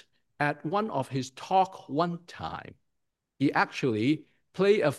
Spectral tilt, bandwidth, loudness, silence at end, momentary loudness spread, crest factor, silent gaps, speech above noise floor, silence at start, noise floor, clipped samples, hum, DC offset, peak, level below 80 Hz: -6 dB/octave; 12.5 kHz; -29 LUFS; 0 s; 12 LU; 20 dB; none; 53 dB; 0.4 s; -81 dBFS; under 0.1%; none; under 0.1%; -10 dBFS; -70 dBFS